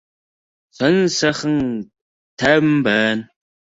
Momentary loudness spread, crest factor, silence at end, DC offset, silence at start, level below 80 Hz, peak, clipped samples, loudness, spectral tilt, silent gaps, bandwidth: 9 LU; 18 dB; 0.45 s; under 0.1%; 0.8 s; -54 dBFS; -2 dBFS; under 0.1%; -17 LUFS; -5 dB/octave; 2.01-2.37 s; 8 kHz